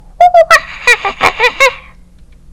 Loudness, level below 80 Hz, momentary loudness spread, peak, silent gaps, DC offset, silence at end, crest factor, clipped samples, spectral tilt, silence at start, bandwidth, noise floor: -8 LUFS; -38 dBFS; 4 LU; 0 dBFS; none; under 0.1%; 0.75 s; 10 dB; 4%; -1 dB/octave; 0.2 s; over 20 kHz; -38 dBFS